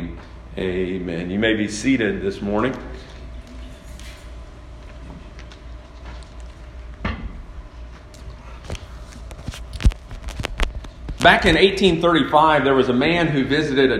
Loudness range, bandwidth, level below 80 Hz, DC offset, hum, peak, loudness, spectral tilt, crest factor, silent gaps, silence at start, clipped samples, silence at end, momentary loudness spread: 22 LU; 13 kHz; -32 dBFS; under 0.1%; none; 0 dBFS; -19 LUFS; -5.5 dB/octave; 22 dB; none; 0 s; under 0.1%; 0 s; 25 LU